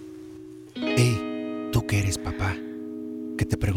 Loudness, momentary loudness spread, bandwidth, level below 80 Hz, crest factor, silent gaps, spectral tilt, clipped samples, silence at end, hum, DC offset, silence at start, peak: -27 LUFS; 19 LU; 16 kHz; -44 dBFS; 20 dB; none; -5.5 dB/octave; under 0.1%; 0 s; none; under 0.1%; 0 s; -8 dBFS